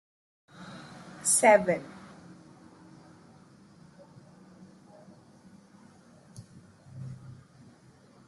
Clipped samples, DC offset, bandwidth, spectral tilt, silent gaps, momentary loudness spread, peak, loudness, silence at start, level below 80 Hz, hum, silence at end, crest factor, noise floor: under 0.1%; under 0.1%; 12.5 kHz; -3 dB/octave; none; 31 LU; -8 dBFS; -24 LUFS; 0.6 s; -74 dBFS; none; 0.95 s; 26 dB; -57 dBFS